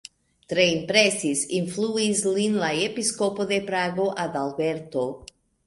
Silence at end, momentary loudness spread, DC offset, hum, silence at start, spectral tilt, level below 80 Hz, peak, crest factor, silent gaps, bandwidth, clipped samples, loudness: 0.4 s; 9 LU; under 0.1%; none; 0.5 s; -3.5 dB/octave; -62 dBFS; -4 dBFS; 22 dB; none; 11.5 kHz; under 0.1%; -24 LUFS